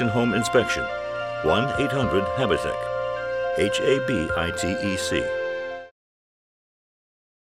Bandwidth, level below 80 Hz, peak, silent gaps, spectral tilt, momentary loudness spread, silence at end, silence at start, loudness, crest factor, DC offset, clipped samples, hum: 15.5 kHz; -48 dBFS; -6 dBFS; none; -5 dB/octave; 7 LU; 1.7 s; 0 s; -24 LUFS; 18 dB; 0.1%; under 0.1%; none